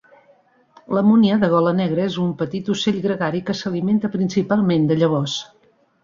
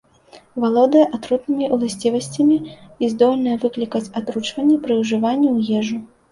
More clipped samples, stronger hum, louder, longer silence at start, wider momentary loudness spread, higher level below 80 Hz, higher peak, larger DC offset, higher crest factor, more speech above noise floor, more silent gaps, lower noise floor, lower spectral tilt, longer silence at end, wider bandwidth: neither; neither; about the same, -19 LUFS vs -19 LUFS; first, 0.9 s vs 0.35 s; about the same, 9 LU vs 9 LU; about the same, -60 dBFS vs -60 dBFS; about the same, -4 dBFS vs -2 dBFS; neither; about the same, 14 dB vs 16 dB; first, 37 dB vs 30 dB; neither; first, -56 dBFS vs -48 dBFS; about the same, -6.5 dB/octave vs -5.5 dB/octave; first, 0.6 s vs 0.25 s; second, 7.6 kHz vs 11.5 kHz